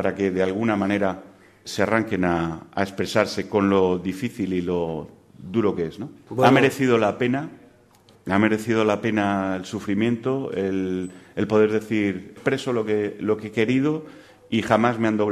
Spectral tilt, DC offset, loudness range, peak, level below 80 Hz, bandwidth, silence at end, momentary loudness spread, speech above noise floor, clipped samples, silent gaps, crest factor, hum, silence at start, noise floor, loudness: -6.5 dB/octave; under 0.1%; 2 LU; -2 dBFS; -56 dBFS; 14 kHz; 0 s; 10 LU; 32 dB; under 0.1%; none; 20 dB; none; 0 s; -54 dBFS; -23 LUFS